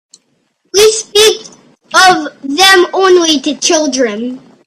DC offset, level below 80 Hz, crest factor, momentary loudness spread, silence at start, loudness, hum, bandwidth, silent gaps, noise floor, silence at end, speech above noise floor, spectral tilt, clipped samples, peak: under 0.1%; -50 dBFS; 10 dB; 11 LU; 0.75 s; -9 LUFS; none; 16.5 kHz; none; -59 dBFS; 0.3 s; 49 dB; -1 dB/octave; 0.3%; 0 dBFS